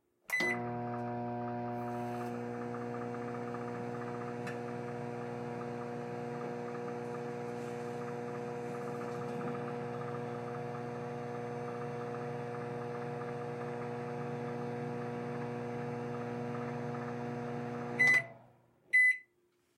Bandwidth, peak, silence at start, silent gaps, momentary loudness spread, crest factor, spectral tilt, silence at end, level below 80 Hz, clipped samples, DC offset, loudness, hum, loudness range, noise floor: 15.5 kHz; -18 dBFS; 0.3 s; none; 10 LU; 20 dB; -6 dB/octave; 0.55 s; -76 dBFS; under 0.1%; under 0.1%; -37 LUFS; none; 7 LU; -74 dBFS